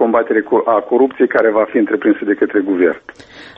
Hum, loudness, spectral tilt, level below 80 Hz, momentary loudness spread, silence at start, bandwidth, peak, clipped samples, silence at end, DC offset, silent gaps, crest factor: none; -14 LUFS; -7.5 dB/octave; -58 dBFS; 2 LU; 0 s; 5.8 kHz; 0 dBFS; under 0.1%; 0.05 s; under 0.1%; none; 14 dB